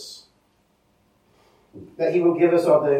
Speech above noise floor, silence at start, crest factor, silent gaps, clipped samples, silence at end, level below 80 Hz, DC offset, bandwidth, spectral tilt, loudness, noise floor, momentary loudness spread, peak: 46 dB; 0 s; 18 dB; none; under 0.1%; 0 s; -70 dBFS; under 0.1%; 13 kHz; -7 dB/octave; -19 LUFS; -64 dBFS; 26 LU; -6 dBFS